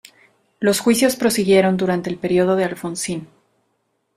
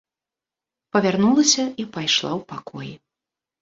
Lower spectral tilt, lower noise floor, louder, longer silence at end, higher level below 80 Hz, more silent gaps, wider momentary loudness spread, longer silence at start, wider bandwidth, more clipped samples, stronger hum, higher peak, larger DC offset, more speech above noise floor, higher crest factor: first, -4.5 dB/octave vs -3 dB/octave; second, -69 dBFS vs -89 dBFS; about the same, -18 LUFS vs -20 LUFS; first, 0.9 s vs 0.65 s; first, -58 dBFS vs -64 dBFS; neither; second, 10 LU vs 19 LU; second, 0.6 s vs 0.95 s; first, 15.5 kHz vs 8 kHz; neither; neither; about the same, -2 dBFS vs -4 dBFS; neither; second, 51 dB vs 68 dB; about the same, 18 dB vs 20 dB